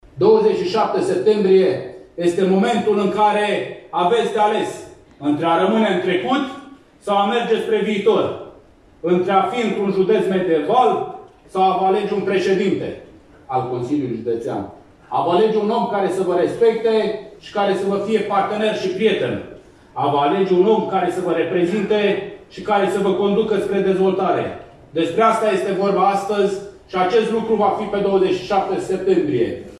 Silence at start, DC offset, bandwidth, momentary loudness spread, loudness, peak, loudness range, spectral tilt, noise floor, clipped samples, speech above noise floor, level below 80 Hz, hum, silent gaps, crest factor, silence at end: 0.15 s; under 0.1%; 12 kHz; 11 LU; -18 LUFS; -2 dBFS; 3 LU; -6.5 dB/octave; -47 dBFS; under 0.1%; 30 dB; -56 dBFS; none; none; 16 dB; 0 s